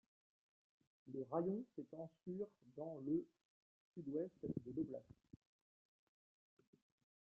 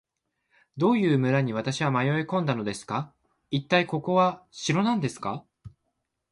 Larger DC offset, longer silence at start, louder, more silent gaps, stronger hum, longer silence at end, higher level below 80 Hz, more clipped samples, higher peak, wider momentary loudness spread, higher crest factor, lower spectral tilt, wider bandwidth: neither; first, 1.05 s vs 0.75 s; second, -48 LUFS vs -26 LUFS; first, 3.45-3.94 s vs none; neither; first, 2.2 s vs 0.65 s; second, -82 dBFS vs -64 dBFS; neither; second, -28 dBFS vs -8 dBFS; about the same, 12 LU vs 10 LU; about the same, 22 dB vs 18 dB; first, -11.5 dB/octave vs -6 dB/octave; second, 3.2 kHz vs 11.5 kHz